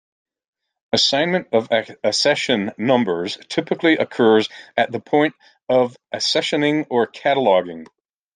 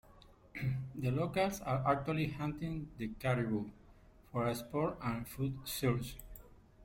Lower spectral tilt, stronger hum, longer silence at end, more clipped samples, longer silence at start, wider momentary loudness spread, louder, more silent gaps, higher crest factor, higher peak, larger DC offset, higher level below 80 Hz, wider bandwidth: second, -4 dB/octave vs -6.5 dB/octave; neither; first, 0.5 s vs 0 s; neither; first, 0.95 s vs 0.1 s; second, 8 LU vs 11 LU; first, -19 LUFS vs -37 LUFS; neither; about the same, 18 dB vs 20 dB; first, -2 dBFS vs -18 dBFS; neither; second, -66 dBFS vs -56 dBFS; second, 9.8 kHz vs 16.5 kHz